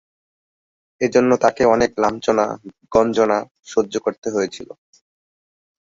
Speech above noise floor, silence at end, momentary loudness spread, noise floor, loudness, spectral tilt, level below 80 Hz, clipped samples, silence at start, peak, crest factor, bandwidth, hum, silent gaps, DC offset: over 72 dB; 1.35 s; 9 LU; under -90 dBFS; -19 LUFS; -5 dB/octave; -52 dBFS; under 0.1%; 1 s; -2 dBFS; 18 dB; 7.8 kHz; none; 3.51-3.55 s, 4.18-4.22 s; under 0.1%